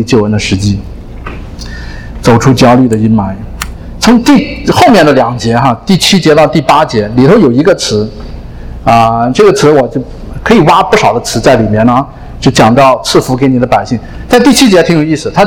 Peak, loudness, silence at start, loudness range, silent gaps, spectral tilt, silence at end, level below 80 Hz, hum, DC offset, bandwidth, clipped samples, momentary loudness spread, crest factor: 0 dBFS; -7 LUFS; 0 s; 3 LU; none; -5.5 dB/octave; 0 s; -26 dBFS; none; under 0.1%; 19 kHz; 5%; 18 LU; 8 dB